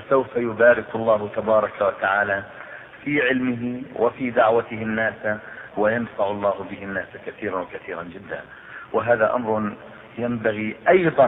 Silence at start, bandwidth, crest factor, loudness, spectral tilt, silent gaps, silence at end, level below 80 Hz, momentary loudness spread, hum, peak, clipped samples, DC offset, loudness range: 0 s; 4 kHz; 18 dB; -22 LUFS; -9.5 dB/octave; none; 0 s; -58 dBFS; 16 LU; none; -4 dBFS; under 0.1%; under 0.1%; 6 LU